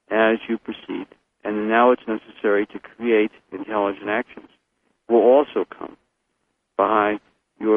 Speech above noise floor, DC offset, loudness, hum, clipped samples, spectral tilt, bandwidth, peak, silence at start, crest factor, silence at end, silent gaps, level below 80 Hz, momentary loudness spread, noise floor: 53 dB; under 0.1%; -21 LUFS; none; under 0.1%; -8 dB/octave; 3.8 kHz; -2 dBFS; 0.1 s; 20 dB; 0 s; none; -64 dBFS; 16 LU; -73 dBFS